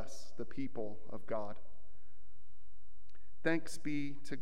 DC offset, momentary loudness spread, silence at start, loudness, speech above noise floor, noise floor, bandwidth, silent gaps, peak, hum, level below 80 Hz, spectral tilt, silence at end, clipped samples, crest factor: 3%; 14 LU; 0 s; -42 LUFS; 25 dB; -66 dBFS; 15 kHz; none; -18 dBFS; none; -68 dBFS; -5.5 dB/octave; 0 s; under 0.1%; 24 dB